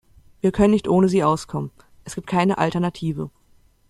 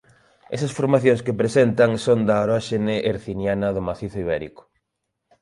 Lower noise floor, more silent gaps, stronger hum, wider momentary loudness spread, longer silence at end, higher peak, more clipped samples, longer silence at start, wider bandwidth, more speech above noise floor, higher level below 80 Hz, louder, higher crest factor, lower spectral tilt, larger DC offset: second, -56 dBFS vs -78 dBFS; neither; neither; first, 17 LU vs 10 LU; second, 0.6 s vs 0.95 s; about the same, -4 dBFS vs -4 dBFS; neither; about the same, 0.45 s vs 0.5 s; about the same, 12 kHz vs 11.5 kHz; second, 36 dB vs 58 dB; about the same, -46 dBFS vs -50 dBFS; about the same, -21 LUFS vs -21 LUFS; about the same, 18 dB vs 18 dB; about the same, -7 dB/octave vs -6.5 dB/octave; neither